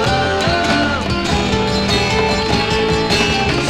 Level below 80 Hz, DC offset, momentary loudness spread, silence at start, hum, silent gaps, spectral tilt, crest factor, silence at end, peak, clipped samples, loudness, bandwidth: -30 dBFS; under 0.1%; 2 LU; 0 s; none; none; -4.5 dB/octave; 14 dB; 0 s; -2 dBFS; under 0.1%; -15 LUFS; 15.5 kHz